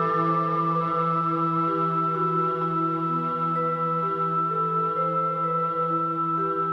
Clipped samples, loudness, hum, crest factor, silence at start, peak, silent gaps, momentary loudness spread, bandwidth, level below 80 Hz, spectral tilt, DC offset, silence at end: under 0.1%; -24 LUFS; none; 12 dB; 0 s; -12 dBFS; none; 1 LU; 5.8 kHz; -68 dBFS; -9.5 dB/octave; under 0.1%; 0 s